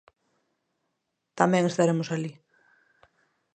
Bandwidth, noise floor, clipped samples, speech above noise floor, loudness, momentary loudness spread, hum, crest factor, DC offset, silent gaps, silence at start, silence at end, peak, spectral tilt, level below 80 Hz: 9.4 kHz; -80 dBFS; under 0.1%; 56 dB; -25 LUFS; 10 LU; none; 26 dB; under 0.1%; none; 1.35 s; 1.2 s; -4 dBFS; -6 dB/octave; -76 dBFS